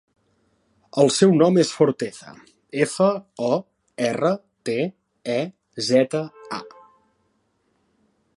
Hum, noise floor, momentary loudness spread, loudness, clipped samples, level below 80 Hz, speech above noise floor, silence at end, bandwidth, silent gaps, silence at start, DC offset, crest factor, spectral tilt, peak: none; -68 dBFS; 16 LU; -22 LUFS; under 0.1%; -70 dBFS; 48 dB; 1.7 s; 11.5 kHz; none; 0.95 s; under 0.1%; 20 dB; -5.5 dB/octave; -2 dBFS